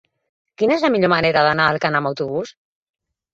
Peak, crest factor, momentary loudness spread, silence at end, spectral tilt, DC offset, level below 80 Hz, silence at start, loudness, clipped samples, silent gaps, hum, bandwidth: 0 dBFS; 20 dB; 10 LU; 0.85 s; -6 dB/octave; under 0.1%; -56 dBFS; 0.6 s; -18 LUFS; under 0.1%; none; none; 8 kHz